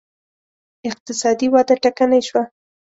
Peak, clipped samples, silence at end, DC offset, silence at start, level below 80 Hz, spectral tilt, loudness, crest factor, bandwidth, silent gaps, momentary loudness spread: -4 dBFS; under 0.1%; 0.45 s; under 0.1%; 0.85 s; -62 dBFS; -3.5 dB/octave; -17 LUFS; 16 dB; 8 kHz; 1.00-1.06 s; 14 LU